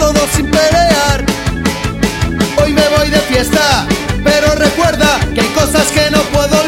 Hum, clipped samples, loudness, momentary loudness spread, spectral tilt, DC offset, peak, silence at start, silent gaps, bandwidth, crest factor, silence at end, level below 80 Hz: none; under 0.1%; -11 LUFS; 6 LU; -4 dB/octave; under 0.1%; 0 dBFS; 0 s; none; 17 kHz; 12 dB; 0 s; -22 dBFS